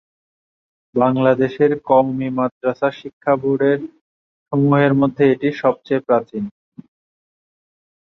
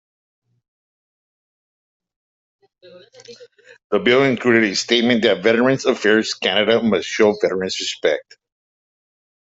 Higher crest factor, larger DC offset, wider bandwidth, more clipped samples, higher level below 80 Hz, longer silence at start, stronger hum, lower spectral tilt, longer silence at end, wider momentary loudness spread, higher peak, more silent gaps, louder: about the same, 18 dB vs 18 dB; neither; second, 6.2 kHz vs 8 kHz; neither; about the same, -60 dBFS vs -62 dBFS; second, 0.95 s vs 2.95 s; neither; first, -9.5 dB/octave vs -4 dB/octave; first, 1.65 s vs 1.3 s; first, 10 LU vs 6 LU; about the same, -2 dBFS vs -2 dBFS; first, 2.51-2.61 s, 3.13-3.21 s, 4.01-4.46 s vs 3.84-3.90 s; about the same, -18 LUFS vs -17 LUFS